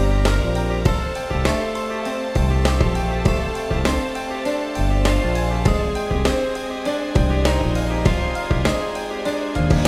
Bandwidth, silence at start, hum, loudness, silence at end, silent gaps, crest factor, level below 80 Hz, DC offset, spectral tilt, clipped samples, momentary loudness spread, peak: 14.5 kHz; 0 s; none; -21 LUFS; 0 s; none; 18 dB; -24 dBFS; under 0.1%; -6 dB/octave; under 0.1%; 6 LU; -2 dBFS